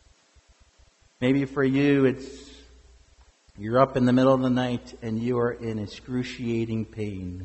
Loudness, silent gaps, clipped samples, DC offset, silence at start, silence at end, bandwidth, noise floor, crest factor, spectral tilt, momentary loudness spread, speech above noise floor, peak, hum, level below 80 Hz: -25 LUFS; none; under 0.1%; under 0.1%; 1.2 s; 0 s; 8.2 kHz; -59 dBFS; 20 dB; -7.5 dB/octave; 13 LU; 35 dB; -6 dBFS; none; -54 dBFS